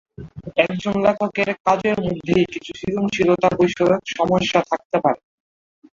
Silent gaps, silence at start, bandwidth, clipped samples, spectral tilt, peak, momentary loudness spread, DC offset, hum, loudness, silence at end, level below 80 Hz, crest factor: 1.60-1.65 s, 4.85-4.90 s; 0.2 s; 7.6 kHz; under 0.1%; -6 dB/octave; -2 dBFS; 7 LU; under 0.1%; none; -20 LUFS; 0.8 s; -50 dBFS; 18 dB